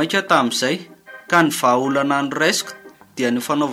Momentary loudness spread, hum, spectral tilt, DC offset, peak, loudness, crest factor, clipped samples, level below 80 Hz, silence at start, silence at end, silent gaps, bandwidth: 8 LU; none; -3.5 dB/octave; under 0.1%; -2 dBFS; -18 LUFS; 18 dB; under 0.1%; -68 dBFS; 0 s; 0 s; none; 16.5 kHz